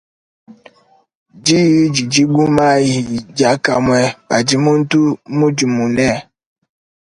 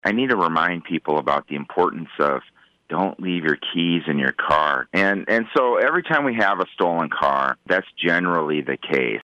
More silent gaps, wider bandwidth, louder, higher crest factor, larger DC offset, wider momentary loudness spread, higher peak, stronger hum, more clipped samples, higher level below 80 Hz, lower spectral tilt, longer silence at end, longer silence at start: first, 1.15-1.26 s vs none; first, 11 kHz vs 9 kHz; first, -14 LUFS vs -21 LUFS; about the same, 14 dB vs 16 dB; neither; about the same, 5 LU vs 5 LU; first, 0 dBFS vs -6 dBFS; neither; neither; first, -48 dBFS vs -58 dBFS; second, -5 dB/octave vs -6.5 dB/octave; first, 0.9 s vs 0 s; first, 0.5 s vs 0.05 s